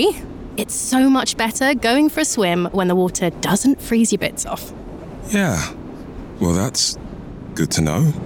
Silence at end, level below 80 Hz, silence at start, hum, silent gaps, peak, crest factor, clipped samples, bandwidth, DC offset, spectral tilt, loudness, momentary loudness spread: 0 s; -40 dBFS; 0 s; none; none; -6 dBFS; 14 dB; under 0.1%; over 20 kHz; under 0.1%; -4.5 dB/octave; -18 LUFS; 18 LU